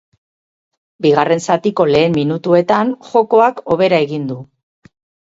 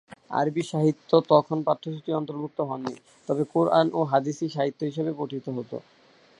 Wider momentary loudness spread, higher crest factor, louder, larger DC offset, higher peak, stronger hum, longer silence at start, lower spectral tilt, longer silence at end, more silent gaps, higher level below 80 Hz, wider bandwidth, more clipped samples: second, 6 LU vs 12 LU; second, 16 dB vs 22 dB; first, -14 LUFS vs -26 LUFS; neither; first, 0 dBFS vs -4 dBFS; neither; first, 1 s vs 0.1 s; about the same, -6 dB/octave vs -7 dB/octave; first, 0.8 s vs 0.6 s; neither; first, -54 dBFS vs -74 dBFS; second, 7.8 kHz vs 11 kHz; neither